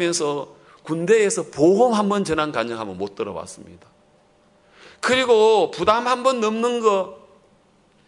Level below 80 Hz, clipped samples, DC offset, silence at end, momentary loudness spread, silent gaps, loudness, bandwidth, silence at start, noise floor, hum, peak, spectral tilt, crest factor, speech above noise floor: -60 dBFS; under 0.1%; under 0.1%; 0.9 s; 14 LU; none; -20 LUFS; 11 kHz; 0 s; -58 dBFS; none; -2 dBFS; -4 dB/octave; 18 dB; 38 dB